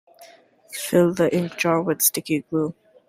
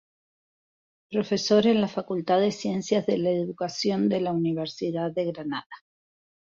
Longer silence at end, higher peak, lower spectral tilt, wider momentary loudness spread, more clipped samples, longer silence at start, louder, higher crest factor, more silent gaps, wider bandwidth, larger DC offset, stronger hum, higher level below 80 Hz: second, 0.35 s vs 0.7 s; first, -4 dBFS vs -8 dBFS; about the same, -4.5 dB/octave vs -5.5 dB/octave; about the same, 10 LU vs 9 LU; neither; second, 0.2 s vs 1.1 s; first, -21 LUFS vs -26 LUFS; about the same, 20 dB vs 18 dB; second, none vs 5.66-5.70 s; first, 16 kHz vs 7.6 kHz; neither; neither; first, -62 dBFS vs -68 dBFS